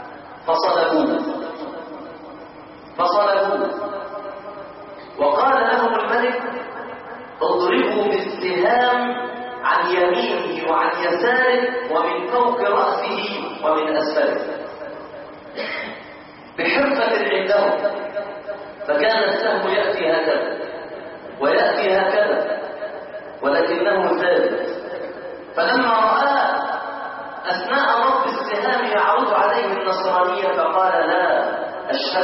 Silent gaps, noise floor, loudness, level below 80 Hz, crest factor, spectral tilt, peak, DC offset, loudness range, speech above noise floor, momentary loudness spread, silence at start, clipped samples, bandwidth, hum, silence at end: none; -40 dBFS; -19 LUFS; -64 dBFS; 14 dB; -7.5 dB/octave; -6 dBFS; under 0.1%; 4 LU; 22 dB; 17 LU; 0 s; under 0.1%; 5.8 kHz; none; 0 s